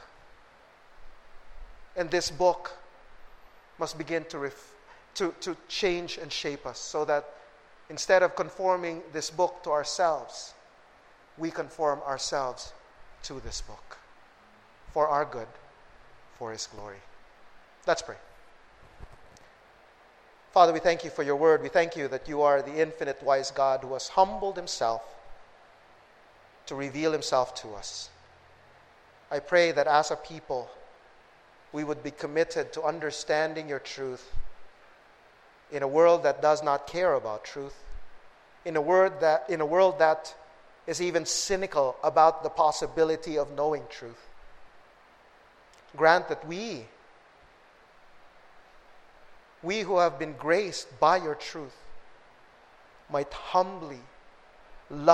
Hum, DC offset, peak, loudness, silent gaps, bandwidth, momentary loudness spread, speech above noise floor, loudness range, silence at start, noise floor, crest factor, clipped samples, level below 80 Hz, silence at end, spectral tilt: none; under 0.1%; -4 dBFS; -28 LUFS; none; 13.5 kHz; 19 LU; 30 dB; 8 LU; 0 s; -57 dBFS; 26 dB; under 0.1%; -54 dBFS; 0 s; -3.5 dB/octave